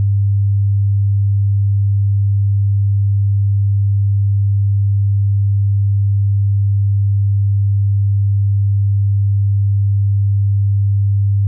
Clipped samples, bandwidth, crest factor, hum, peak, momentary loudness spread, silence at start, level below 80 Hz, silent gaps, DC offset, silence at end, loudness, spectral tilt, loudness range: under 0.1%; 0.2 kHz; 4 dB; none; -10 dBFS; 0 LU; 0 s; -46 dBFS; none; under 0.1%; 0 s; -15 LUFS; -34 dB/octave; 0 LU